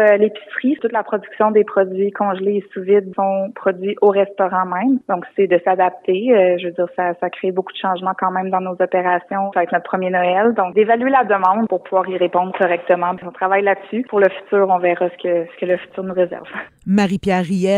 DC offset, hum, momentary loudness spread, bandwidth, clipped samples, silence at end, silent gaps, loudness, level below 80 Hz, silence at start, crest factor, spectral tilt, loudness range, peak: under 0.1%; none; 7 LU; 10 kHz; under 0.1%; 0 s; none; -17 LUFS; -60 dBFS; 0 s; 16 dB; -7 dB/octave; 2 LU; -2 dBFS